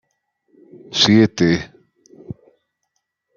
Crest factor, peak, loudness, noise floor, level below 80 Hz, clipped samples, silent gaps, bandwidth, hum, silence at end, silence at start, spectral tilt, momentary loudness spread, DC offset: 20 dB; 0 dBFS; -15 LUFS; -74 dBFS; -54 dBFS; under 0.1%; none; 7.4 kHz; none; 1.05 s; 0.9 s; -5 dB/octave; 25 LU; under 0.1%